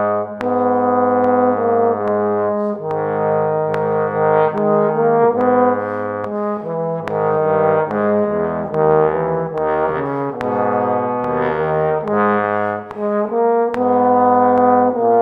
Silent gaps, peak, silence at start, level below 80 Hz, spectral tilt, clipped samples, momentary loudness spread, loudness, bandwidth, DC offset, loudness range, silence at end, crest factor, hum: none; 0 dBFS; 0 s; -52 dBFS; -9.5 dB/octave; under 0.1%; 7 LU; -17 LUFS; 4.6 kHz; under 0.1%; 2 LU; 0 s; 16 dB; none